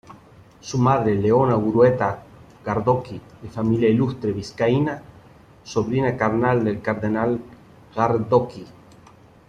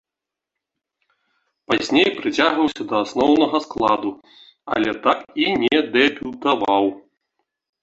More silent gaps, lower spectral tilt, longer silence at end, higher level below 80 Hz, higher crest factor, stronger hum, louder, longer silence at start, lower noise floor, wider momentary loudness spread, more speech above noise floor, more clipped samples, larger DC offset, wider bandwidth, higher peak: neither; first, -7.5 dB/octave vs -4.5 dB/octave; about the same, 0.75 s vs 0.85 s; first, -52 dBFS vs -58 dBFS; about the same, 18 dB vs 20 dB; neither; about the same, -21 LUFS vs -19 LUFS; second, 0.1 s vs 1.7 s; second, -49 dBFS vs -86 dBFS; first, 17 LU vs 7 LU; second, 29 dB vs 67 dB; neither; neither; first, 9.4 kHz vs 8 kHz; about the same, -4 dBFS vs -2 dBFS